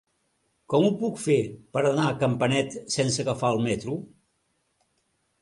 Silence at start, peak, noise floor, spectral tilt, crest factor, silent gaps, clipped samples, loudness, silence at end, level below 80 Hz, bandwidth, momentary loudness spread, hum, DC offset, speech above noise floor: 0.7 s; -10 dBFS; -73 dBFS; -5.5 dB/octave; 18 dB; none; under 0.1%; -25 LUFS; 1.35 s; -60 dBFS; 11.5 kHz; 6 LU; none; under 0.1%; 48 dB